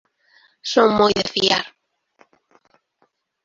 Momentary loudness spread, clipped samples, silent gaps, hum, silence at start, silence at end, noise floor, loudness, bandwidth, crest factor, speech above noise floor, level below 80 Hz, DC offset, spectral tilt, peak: 14 LU; under 0.1%; none; none; 0.65 s; 1.75 s; -66 dBFS; -17 LUFS; 7.8 kHz; 22 dB; 49 dB; -56 dBFS; under 0.1%; -3.5 dB/octave; 0 dBFS